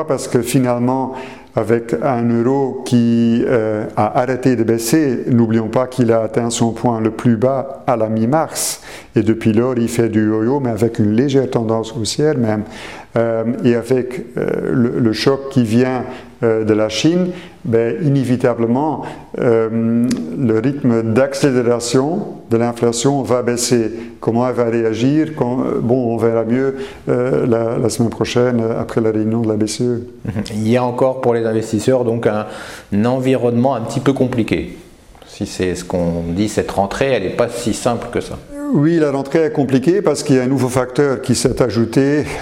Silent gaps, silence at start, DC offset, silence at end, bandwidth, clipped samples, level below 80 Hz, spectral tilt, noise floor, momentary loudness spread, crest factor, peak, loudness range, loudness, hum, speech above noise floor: none; 0 s; 0.4%; 0 s; 16 kHz; under 0.1%; -46 dBFS; -6 dB/octave; -41 dBFS; 6 LU; 16 dB; 0 dBFS; 3 LU; -16 LUFS; none; 25 dB